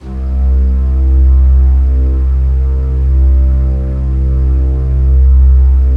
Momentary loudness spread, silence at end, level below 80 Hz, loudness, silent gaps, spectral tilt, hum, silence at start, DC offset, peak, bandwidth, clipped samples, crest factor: 6 LU; 0 s; -8 dBFS; -12 LUFS; none; -11 dB/octave; none; 0.05 s; under 0.1%; 0 dBFS; 1.8 kHz; under 0.1%; 8 dB